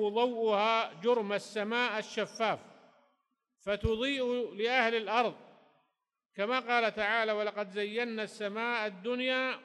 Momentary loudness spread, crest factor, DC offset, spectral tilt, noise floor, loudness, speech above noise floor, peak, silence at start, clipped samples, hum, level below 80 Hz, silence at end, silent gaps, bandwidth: 8 LU; 18 dB; under 0.1%; -4.5 dB/octave; -83 dBFS; -32 LUFS; 52 dB; -14 dBFS; 0 s; under 0.1%; none; -56 dBFS; 0 s; none; 11.5 kHz